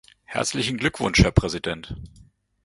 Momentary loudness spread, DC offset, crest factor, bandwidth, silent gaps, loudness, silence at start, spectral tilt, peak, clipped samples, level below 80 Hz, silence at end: 16 LU; under 0.1%; 24 dB; 11.5 kHz; none; -23 LUFS; 0.3 s; -4.5 dB/octave; 0 dBFS; under 0.1%; -34 dBFS; 0.55 s